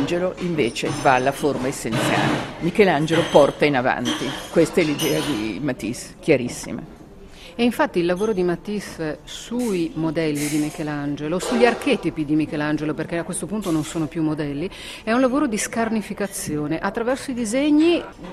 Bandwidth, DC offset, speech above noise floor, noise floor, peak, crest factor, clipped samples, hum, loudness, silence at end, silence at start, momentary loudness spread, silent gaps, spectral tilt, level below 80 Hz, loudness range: 15 kHz; under 0.1%; 20 dB; -42 dBFS; 0 dBFS; 22 dB; under 0.1%; none; -22 LUFS; 0 s; 0 s; 10 LU; none; -5 dB/octave; -48 dBFS; 5 LU